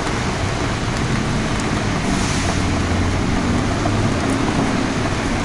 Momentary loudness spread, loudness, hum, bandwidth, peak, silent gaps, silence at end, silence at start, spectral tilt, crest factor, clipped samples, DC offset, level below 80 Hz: 2 LU; -19 LUFS; none; 11.5 kHz; -6 dBFS; none; 0 s; 0 s; -5 dB/octave; 12 dB; under 0.1%; under 0.1%; -30 dBFS